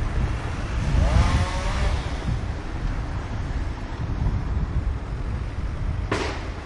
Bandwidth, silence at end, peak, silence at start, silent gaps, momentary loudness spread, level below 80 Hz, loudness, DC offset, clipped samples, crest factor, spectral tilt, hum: 11 kHz; 0 s; -8 dBFS; 0 s; none; 9 LU; -26 dBFS; -27 LUFS; under 0.1%; under 0.1%; 18 dB; -6 dB/octave; none